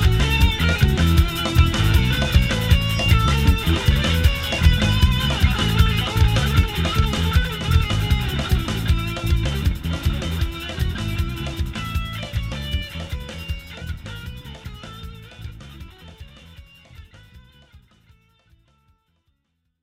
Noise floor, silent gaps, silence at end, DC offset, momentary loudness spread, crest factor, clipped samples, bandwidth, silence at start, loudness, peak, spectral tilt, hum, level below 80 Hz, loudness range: -72 dBFS; none; 2.05 s; under 0.1%; 17 LU; 18 dB; under 0.1%; 16 kHz; 0 s; -20 LUFS; -2 dBFS; -5.5 dB/octave; none; -24 dBFS; 18 LU